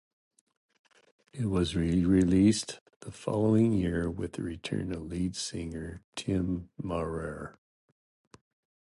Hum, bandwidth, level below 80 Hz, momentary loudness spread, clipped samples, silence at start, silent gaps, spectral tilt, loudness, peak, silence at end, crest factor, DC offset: none; 11.5 kHz; -48 dBFS; 16 LU; under 0.1%; 1.35 s; 2.81-2.86 s, 2.96-3.01 s, 6.04-6.12 s; -6.5 dB/octave; -30 LUFS; -12 dBFS; 1.35 s; 18 dB; under 0.1%